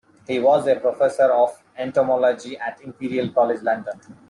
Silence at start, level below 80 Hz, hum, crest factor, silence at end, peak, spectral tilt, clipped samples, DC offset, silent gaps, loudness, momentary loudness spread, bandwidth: 0.3 s; -68 dBFS; none; 14 dB; 0.15 s; -6 dBFS; -6 dB/octave; under 0.1%; under 0.1%; none; -20 LUFS; 13 LU; 11 kHz